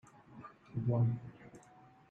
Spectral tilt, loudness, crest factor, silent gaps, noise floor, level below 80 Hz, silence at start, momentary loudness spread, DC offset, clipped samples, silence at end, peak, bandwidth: -10 dB/octave; -36 LUFS; 16 dB; none; -61 dBFS; -68 dBFS; 0.3 s; 24 LU; under 0.1%; under 0.1%; 0.5 s; -22 dBFS; 3 kHz